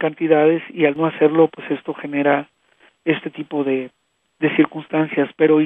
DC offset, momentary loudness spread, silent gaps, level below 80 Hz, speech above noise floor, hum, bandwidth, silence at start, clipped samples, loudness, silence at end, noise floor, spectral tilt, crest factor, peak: under 0.1%; 10 LU; none; -72 dBFS; 38 dB; none; 3.8 kHz; 0 s; under 0.1%; -19 LUFS; 0 s; -56 dBFS; -9.5 dB/octave; 18 dB; 0 dBFS